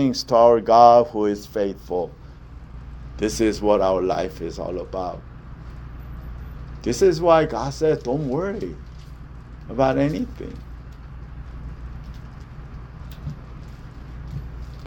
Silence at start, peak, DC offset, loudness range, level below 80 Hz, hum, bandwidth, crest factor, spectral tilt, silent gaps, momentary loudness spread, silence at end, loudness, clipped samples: 0 s; 0 dBFS; under 0.1%; 18 LU; -38 dBFS; none; 19.5 kHz; 22 dB; -6 dB/octave; none; 24 LU; 0 s; -20 LUFS; under 0.1%